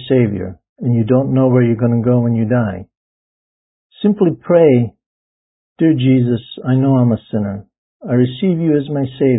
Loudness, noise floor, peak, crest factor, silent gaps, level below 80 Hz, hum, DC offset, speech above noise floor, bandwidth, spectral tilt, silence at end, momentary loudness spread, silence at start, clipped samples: -15 LUFS; under -90 dBFS; 0 dBFS; 14 dB; 0.69-0.76 s, 2.97-3.90 s, 5.06-5.76 s, 7.78-8.00 s; -48 dBFS; none; under 0.1%; over 76 dB; 4 kHz; -13 dB/octave; 0 s; 11 LU; 0 s; under 0.1%